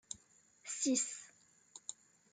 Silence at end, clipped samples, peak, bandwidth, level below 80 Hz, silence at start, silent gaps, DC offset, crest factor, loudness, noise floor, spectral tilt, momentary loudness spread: 0.4 s; under 0.1%; -22 dBFS; 9.6 kHz; -86 dBFS; 0.1 s; none; under 0.1%; 20 dB; -39 LUFS; -68 dBFS; -1 dB/octave; 21 LU